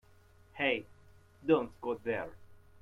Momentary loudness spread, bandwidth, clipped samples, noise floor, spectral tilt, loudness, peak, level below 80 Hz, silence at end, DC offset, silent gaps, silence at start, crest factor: 13 LU; 6.2 kHz; under 0.1%; -61 dBFS; -7 dB/octave; -34 LUFS; -14 dBFS; -66 dBFS; 0.25 s; under 0.1%; none; 0.55 s; 22 dB